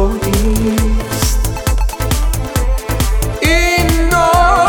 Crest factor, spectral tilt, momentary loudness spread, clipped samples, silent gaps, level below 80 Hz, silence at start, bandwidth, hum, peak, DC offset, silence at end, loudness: 12 dB; -4.5 dB/octave; 7 LU; under 0.1%; none; -16 dBFS; 0 s; 19 kHz; none; 0 dBFS; 0.7%; 0 s; -14 LUFS